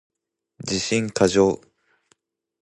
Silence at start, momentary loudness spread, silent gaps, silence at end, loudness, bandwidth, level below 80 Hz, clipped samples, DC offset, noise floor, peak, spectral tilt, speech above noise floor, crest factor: 0.65 s; 14 LU; none; 1.05 s; -21 LUFS; 11.5 kHz; -52 dBFS; under 0.1%; under 0.1%; -67 dBFS; -4 dBFS; -4.5 dB/octave; 47 dB; 20 dB